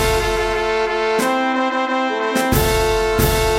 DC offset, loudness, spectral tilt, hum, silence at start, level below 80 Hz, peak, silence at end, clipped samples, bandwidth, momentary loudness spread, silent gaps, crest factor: 0.2%; -18 LUFS; -4 dB/octave; none; 0 s; -28 dBFS; -2 dBFS; 0 s; under 0.1%; 17 kHz; 3 LU; none; 16 dB